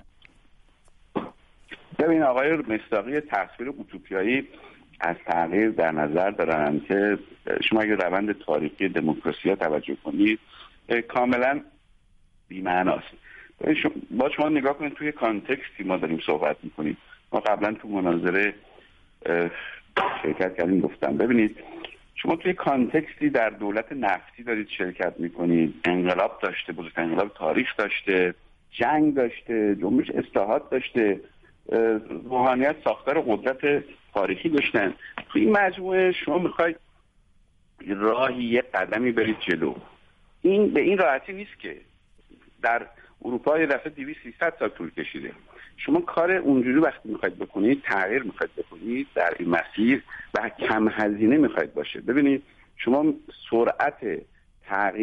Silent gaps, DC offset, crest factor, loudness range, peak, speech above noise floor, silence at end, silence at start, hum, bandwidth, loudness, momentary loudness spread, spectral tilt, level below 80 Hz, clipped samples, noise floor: none; under 0.1%; 18 dB; 3 LU; -8 dBFS; 35 dB; 0 s; 1.15 s; none; 6.2 kHz; -25 LUFS; 11 LU; -7.5 dB/octave; -58 dBFS; under 0.1%; -60 dBFS